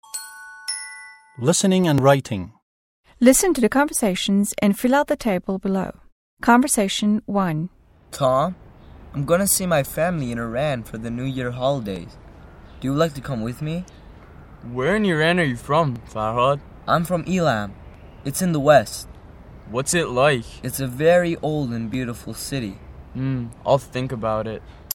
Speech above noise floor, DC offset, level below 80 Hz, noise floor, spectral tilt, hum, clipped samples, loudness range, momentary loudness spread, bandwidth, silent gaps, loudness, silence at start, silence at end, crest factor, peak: 23 dB; under 0.1%; -46 dBFS; -43 dBFS; -5 dB/octave; none; under 0.1%; 6 LU; 16 LU; 17 kHz; 2.62-3.04 s, 6.12-6.37 s; -21 LUFS; 0.15 s; 0.15 s; 20 dB; 0 dBFS